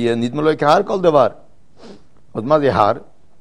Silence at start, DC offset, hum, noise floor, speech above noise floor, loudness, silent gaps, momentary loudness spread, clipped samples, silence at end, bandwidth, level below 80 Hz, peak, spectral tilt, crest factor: 0 s; 1%; none; -44 dBFS; 29 dB; -16 LUFS; none; 12 LU; under 0.1%; 0.4 s; 10.5 kHz; -50 dBFS; 0 dBFS; -6.5 dB/octave; 18 dB